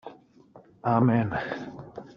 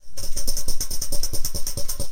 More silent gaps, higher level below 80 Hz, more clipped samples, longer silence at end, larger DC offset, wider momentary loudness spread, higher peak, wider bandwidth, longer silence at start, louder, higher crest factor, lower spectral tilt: neither; second, -60 dBFS vs -26 dBFS; neither; about the same, 0.05 s vs 0 s; second, under 0.1% vs 6%; first, 20 LU vs 2 LU; about the same, -8 dBFS vs -6 dBFS; second, 6.4 kHz vs 16.5 kHz; about the same, 0.05 s vs 0 s; about the same, -26 LUFS vs -28 LUFS; first, 20 dB vs 12 dB; first, -7.5 dB/octave vs -2 dB/octave